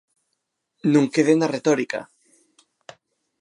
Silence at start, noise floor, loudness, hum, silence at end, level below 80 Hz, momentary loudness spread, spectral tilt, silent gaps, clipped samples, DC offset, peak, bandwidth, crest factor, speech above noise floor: 0.85 s; -77 dBFS; -21 LUFS; none; 1.35 s; -78 dBFS; 10 LU; -6 dB/octave; none; under 0.1%; under 0.1%; -6 dBFS; 11 kHz; 18 dB; 58 dB